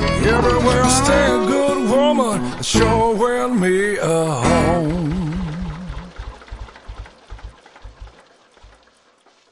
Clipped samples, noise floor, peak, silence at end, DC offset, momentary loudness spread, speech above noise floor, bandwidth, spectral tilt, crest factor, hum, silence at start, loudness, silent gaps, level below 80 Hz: under 0.1%; -55 dBFS; -2 dBFS; 1.4 s; under 0.1%; 22 LU; 40 dB; 11.5 kHz; -5 dB/octave; 18 dB; none; 0 s; -17 LUFS; none; -32 dBFS